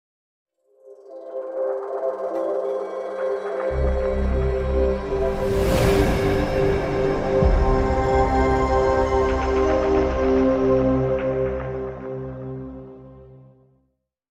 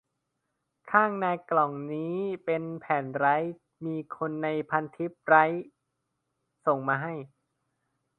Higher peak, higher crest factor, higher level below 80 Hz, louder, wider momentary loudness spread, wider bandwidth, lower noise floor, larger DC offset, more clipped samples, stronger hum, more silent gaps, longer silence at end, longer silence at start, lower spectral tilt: about the same, -4 dBFS vs -6 dBFS; second, 16 dB vs 24 dB; first, -28 dBFS vs -78 dBFS; first, -22 LUFS vs -28 LUFS; about the same, 13 LU vs 13 LU; first, 16 kHz vs 4.3 kHz; second, -71 dBFS vs -81 dBFS; neither; neither; neither; neither; about the same, 0.95 s vs 0.95 s; about the same, 0.85 s vs 0.85 s; second, -7 dB/octave vs -9 dB/octave